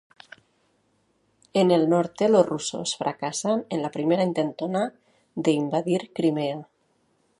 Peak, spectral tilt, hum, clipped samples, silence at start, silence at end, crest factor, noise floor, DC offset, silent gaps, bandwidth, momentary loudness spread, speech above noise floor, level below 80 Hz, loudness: -4 dBFS; -5.5 dB/octave; none; under 0.1%; 1.55 s; 0.75 s; 22 dB; -68 dBFS; under 0.1%; none; 11.5 kHz; 9 LU; 44 dB; -72 dBFS; -24 LUFS